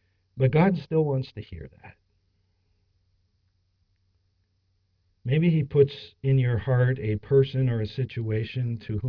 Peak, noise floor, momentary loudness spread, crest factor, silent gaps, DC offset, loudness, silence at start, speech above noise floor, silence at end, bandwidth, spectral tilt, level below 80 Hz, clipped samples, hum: -8 dBFS; -71 dBFS; 10 LU; 18 dB; none; under 0.1%; -25 LUFS; 0.35 s; 47 dB; 0 s; 5.4 kHz; -10.5 dB/octave; -54 dBFS; under 0.1%; none